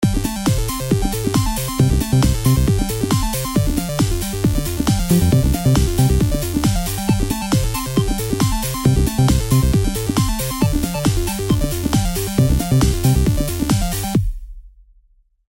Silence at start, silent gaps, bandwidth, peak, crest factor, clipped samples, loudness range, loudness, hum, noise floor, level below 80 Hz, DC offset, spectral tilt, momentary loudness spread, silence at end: 0 s; none; 17 kHz; -2 dBFS; 16 dB; under 0.1%; 1 LU; -18 LUFS; none; -55 dBFS; -24 dBFS; under 0.1%; -5.5 dB/octave; 4 LU; 0.8 s